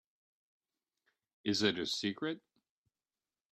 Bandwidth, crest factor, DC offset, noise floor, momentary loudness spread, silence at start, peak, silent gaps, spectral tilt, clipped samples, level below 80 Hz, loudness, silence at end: 13 kHz; 24 dB; under 0.1%; under -90 dBFS; 10 LU; 1.45 s; -16 dBFS; none; -3.5 dB/octave; under 0.1%; -78 dBFS; -35 LUFS; 1.15 s